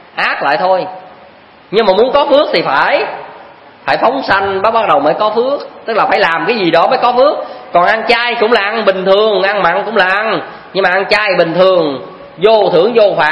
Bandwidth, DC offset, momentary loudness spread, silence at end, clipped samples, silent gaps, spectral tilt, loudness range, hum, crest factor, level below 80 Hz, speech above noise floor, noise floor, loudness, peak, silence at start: 11 kHz; under 0.1%; 7 LU; 0 s; 0.2%; none; -5.5 dB/octave; 2 LU; none; 12 dB; -50 dBFS; 28 dB; -39 dBFS; -11 LUFS; 0 dBFS; 0.15 s